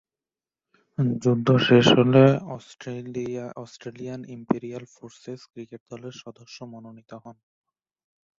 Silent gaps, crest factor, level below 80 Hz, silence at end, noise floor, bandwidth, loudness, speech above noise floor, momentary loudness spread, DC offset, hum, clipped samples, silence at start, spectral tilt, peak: 5.80-5.86 s; 22 dB; -62 dBFS; 1.05 s; under -90 dBFS; 7.6 kHz; -21 LUFS; over 66 dB; 26 LU; under 0.1%; none; under 0.1%; 1 s; -6.5 dB/octave; -4 dBFS